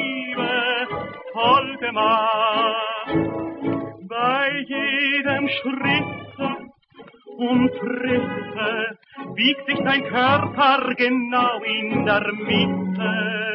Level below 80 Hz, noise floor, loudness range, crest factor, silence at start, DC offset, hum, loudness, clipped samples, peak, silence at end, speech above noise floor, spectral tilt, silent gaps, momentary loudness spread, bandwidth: -58 dBFS; -47 dBFS; 4 LU; 16 dB; 0 s; under 0.1%; none; -21 LUFS; under 0.1%; -4 dBFS; 0 s; 26 dB; -9.5 dB/octave; none; 10 LU; 5.8 kHz